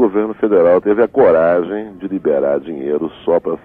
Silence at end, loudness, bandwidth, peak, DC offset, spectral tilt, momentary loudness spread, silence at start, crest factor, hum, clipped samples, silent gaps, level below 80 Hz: 0.1 s; -15 LUFS; 3.8 kHz; -2 dBFS; under 0.1%; -9.5 dB/octave; 9 LU; 0 s; 12 dB; none; under 0.1%; none; -52 dBFS